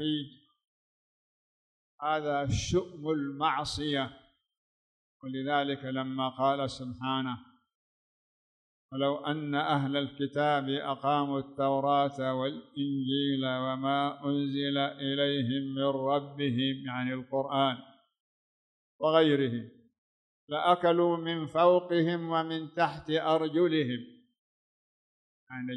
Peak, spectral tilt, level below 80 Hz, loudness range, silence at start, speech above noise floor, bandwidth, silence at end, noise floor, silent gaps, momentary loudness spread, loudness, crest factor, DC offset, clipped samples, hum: -10 dBFS; -6 dB/octave; -60 dBFS; 6 LU; 0 s; over 60 dB; 10 kHz; 0 s; under -90 dBFS; 0.68-1.98 s, 4.57-5.20 s, 7.75-8.89 s, 18.20-18.99 s, 19.98-20.48 s, 24.39-25.47 s; 10 LU; -30 LUFS; 20 dB; under 0.1%; under 0.1%; none